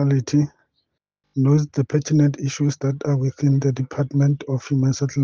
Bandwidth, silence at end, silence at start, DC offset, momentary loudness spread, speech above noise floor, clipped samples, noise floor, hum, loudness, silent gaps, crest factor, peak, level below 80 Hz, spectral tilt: 7.2 kHz; 0 s; 0 s; under 0.1%; 6 LU; 56 dB; under 0.1%; -76 dBFS; none; -21 LUFS; none; 14 dB; -6 dBFS; -60 dBFS; -7.5 dB/octave